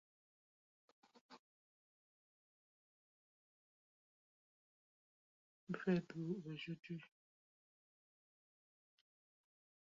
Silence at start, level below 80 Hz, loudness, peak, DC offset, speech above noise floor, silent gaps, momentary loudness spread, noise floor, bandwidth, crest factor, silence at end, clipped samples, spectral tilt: 1.3 s; -88 dBFS; -45 LUFS; -26 dBFS; under 0.1%; over 46 dB; 1.39-5.67 s, 6.79-6.83 s; 26 LU; under -90 dBFS; 7.4 kHz; 26 dB; 2.9 s; under 0.1%; -6.5 dB/octave